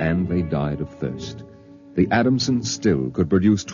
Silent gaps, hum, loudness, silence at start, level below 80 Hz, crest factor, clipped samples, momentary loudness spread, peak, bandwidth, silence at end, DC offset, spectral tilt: none; none; -21 LUFS; 0 s; -44 dBFS; 16 dB; under 0.1%; 11 LU; -6 dBFS; 7.4 kHz; 0 s; under 0.1%; -6 dB/octave